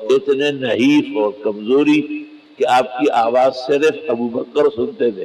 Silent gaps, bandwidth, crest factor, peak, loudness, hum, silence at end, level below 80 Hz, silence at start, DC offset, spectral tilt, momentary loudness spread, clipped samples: none; 12 kHz; 10 dB; -6 dBFS; -16 LUFS; none; 0 s; -62 dBFS; 0 s; under 0.1%; -5.5 dB/octave; 7 LU; under 0.1%